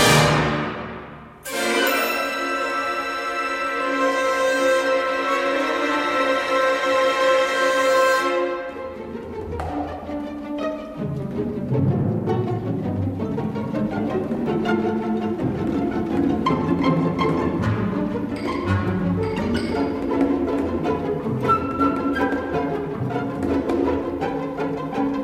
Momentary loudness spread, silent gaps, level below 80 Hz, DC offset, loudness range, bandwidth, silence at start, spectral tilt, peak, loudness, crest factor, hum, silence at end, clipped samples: 10 LU; none; -44 dBFS; under 0.1%; 5 LU; 16 kHz; 0 s; -5.5 dB/octave; -4 dBFS; -22 LUFS; 18 dB; none; 0 s; under 0.1%